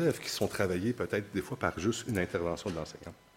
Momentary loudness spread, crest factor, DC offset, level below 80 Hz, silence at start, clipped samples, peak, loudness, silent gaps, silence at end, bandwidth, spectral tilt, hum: 7 LU; 20 dB; under 0.1%; -58 dBFS; 0 s; under 0.1%; -12 dBFS; -33 LUFS; none; 0.25 s; 16.5 kHz; -5 dB/octave; none